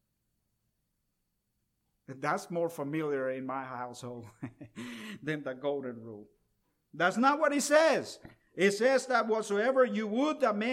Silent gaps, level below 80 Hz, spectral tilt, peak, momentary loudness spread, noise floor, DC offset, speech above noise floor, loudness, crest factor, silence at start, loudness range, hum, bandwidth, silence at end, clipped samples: none; -76 dBFS; -4.5 dB/octave; -12 dBFS; 20 LU; -80 dBFS; under 0.1%; 50 dB; -30 LUFS; 20 dB; 2.1 s; 11 LU; none; 16 kHz; 0 s; under 0.1%